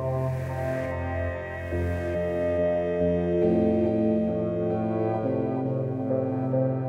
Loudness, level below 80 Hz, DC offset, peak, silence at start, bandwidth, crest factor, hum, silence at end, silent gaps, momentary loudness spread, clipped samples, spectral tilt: -27 LUFS; -46 dBFS; under 0.1%; -12 dBFS; 0 s; 10.5 kHz; 14 dB; none; 0 s; none; 6 LU; under 0.1%; -9.5 dB/octave